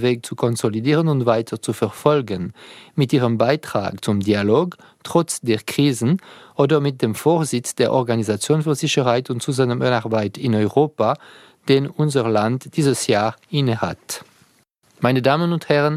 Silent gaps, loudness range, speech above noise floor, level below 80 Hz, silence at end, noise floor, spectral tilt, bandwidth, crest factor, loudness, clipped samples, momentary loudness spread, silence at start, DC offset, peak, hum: none; 1 LU; 40 dB; -60 dBFS; 0 s; -59 dBFS; -5.5 dB/octave; 15.5 kHz; 18 dB; -20 LUFS; under 0.1%; 7 LU; 0 s; under 0.1%; 0 dBFS; none